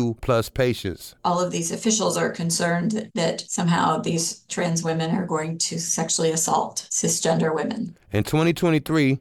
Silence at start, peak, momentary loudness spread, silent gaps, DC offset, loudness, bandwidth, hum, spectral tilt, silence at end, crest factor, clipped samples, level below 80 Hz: 0 s; -8 dBFS; 6 LU; none; under 0.1%; -23 LUFS; 17 kHz; none; -4 dB/octave; 0 s; 16 dB; under 0.1%; -50 dBFS